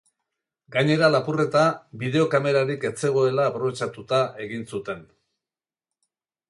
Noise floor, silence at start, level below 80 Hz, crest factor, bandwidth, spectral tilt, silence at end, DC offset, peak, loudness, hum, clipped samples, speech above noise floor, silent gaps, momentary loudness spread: under -90 dBFS; 0.7 s; -66 dBFS; 20 dB; 11.5 kHz; -6 dB/octave; 1.45 s; under 0.1%; -6 dBFS; -23 LUFS; none; under 0.1%; over 67 dB; none; 12 LU